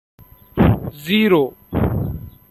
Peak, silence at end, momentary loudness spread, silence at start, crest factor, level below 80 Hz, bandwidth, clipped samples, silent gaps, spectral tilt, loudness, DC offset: -2 dBFS; 0.2 s; 13 LU; 0.55 s; 16 dB; -34 dBFS; 13.5 kHz; under 0.1%; none; -7.5 dB/octave; -18 LUFS; under 0.1%